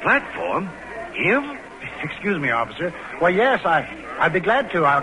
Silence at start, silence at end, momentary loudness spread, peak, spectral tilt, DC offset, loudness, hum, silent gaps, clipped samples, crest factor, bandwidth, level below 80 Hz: 0 s; 0 s; 14 LU; -6 dBFS; -6 dB/octave; under 0.1%; -21 LUFS; none; none; under 0.1%; 16 dB; 11 kHz; -54 dBFS